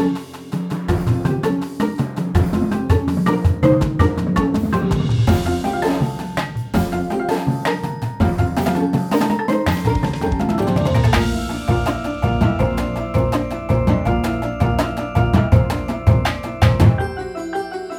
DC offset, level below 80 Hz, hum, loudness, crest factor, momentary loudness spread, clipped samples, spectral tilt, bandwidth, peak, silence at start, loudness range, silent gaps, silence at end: under 0.1%; -28 dBFS; none; -19 LUFS; 16 dB; 7 LU; under 0.1%; -7.5 dB/octave; 18 kHz; 0 dBFS; 0 s; 2 LU; none; 0 s